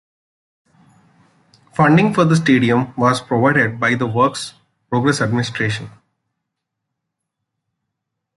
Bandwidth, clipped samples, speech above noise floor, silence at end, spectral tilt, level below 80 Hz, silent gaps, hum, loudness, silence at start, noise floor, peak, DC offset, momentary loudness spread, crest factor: 11.5 kHz; under 0.1%; 63 dB; 2.5 s; -6 dB/octave; -56 dBFS; none; none; -16 LUFS; 1.8 s; -78 dBFS; -2 dBFS; under 0.1%; 10 LU; 18 dB